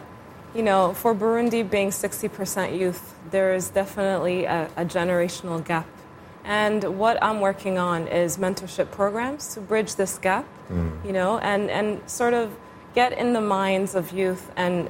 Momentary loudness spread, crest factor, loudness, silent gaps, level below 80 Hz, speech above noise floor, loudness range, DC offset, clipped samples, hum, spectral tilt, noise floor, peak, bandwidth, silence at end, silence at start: 7 LU; 18 dB; -24 LUFS; none; -52 dBFS; 20 dB; 2 LU; under 0.1%; under 0.1%; none; -4.5 dB/octave; -44 dBFS; -6 dBFS; 16.5 kHz; 0 s; 0 s